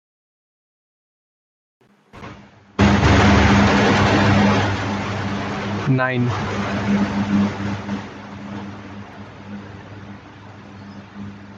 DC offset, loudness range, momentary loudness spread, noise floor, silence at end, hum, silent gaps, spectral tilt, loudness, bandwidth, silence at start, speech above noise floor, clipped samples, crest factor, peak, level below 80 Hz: under 0.1%; 16 LU; 24 LU; -43 dBFS; 0 s; none; none; -6 dB/octave; -18 LUFS; 7.8 kHz; 2.15 s; 23 dB; under 0.1%; 18 dB; -2 dBFS; -36 dBFS